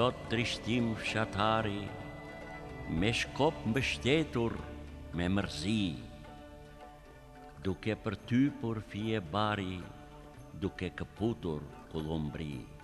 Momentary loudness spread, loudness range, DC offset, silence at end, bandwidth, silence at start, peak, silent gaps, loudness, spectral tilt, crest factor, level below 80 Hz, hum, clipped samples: 20 LU; 5 LU; under 0.1%; 0 s; 13 kHz; 0 s; -16 dBFS; none; -34 LUFS; -5.5 dB/octave; 20 dB; -52 dBFS; none; under 0.1%